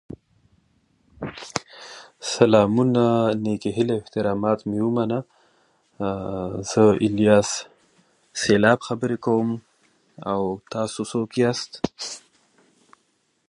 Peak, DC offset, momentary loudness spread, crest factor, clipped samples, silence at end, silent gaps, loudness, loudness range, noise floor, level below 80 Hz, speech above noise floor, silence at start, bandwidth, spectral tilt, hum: -2 dBFS; under 0.1%; 17 LU; 22 dB; under 0.1%; 1.3 s; none; -22 LUFS; 6 LU; -68 dBFS; -56 dBFS; 47 dB; 0.1 s; 11.5 kHz; -5.5 dB/octave; none